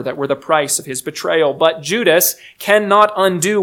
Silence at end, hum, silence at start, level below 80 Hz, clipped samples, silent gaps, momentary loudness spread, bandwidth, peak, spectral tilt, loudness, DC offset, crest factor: 0 s; none; 0 s; -64 dBFS; under 0.1%; none; 9 LU; 19.5 kHz; 0 dBFS; -3 dB/octave; -15 LUFS; under 0.1%; 16 dB